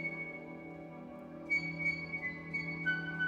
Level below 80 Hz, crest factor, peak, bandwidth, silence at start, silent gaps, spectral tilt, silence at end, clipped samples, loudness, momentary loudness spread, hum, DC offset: -68 dBFS; 16 dB; -24 dBFS; 9.6 kHz; 0 s; none; -6 dB/octave; 0 s; under 0.1%; -36 LUFS; 14 LU; none; under 0.1%